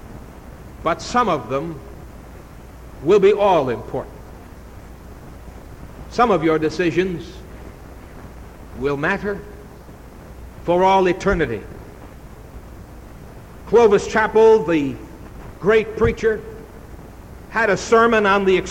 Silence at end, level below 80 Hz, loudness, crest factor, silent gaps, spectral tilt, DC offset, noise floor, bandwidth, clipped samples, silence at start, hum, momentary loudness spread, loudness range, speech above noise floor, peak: 0 s; -40 dBFS; -18 LUFS; 16 dB; none; -5.5 dB/octave; under 0.1%; -39 dBFS; 16 kHz; under 0.1%; 0.05 s; none; 26 LU; 6 LU; 22 dB; -4 dBFS